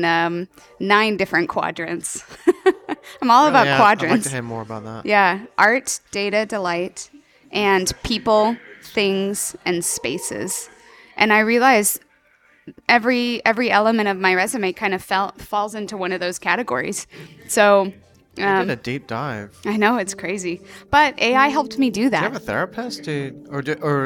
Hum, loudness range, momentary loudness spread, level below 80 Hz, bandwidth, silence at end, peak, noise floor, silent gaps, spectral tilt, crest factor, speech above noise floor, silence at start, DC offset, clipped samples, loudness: none; 4 LU; 14 LU; -52 dBFS; 18.5 kHz; 0 s; -2 dBFS; -57 dBFS; none; -3.5 dB/octave; 18 dB; 37 dB; 0 s; under 0.1%; under 0.1%; -19 LUFS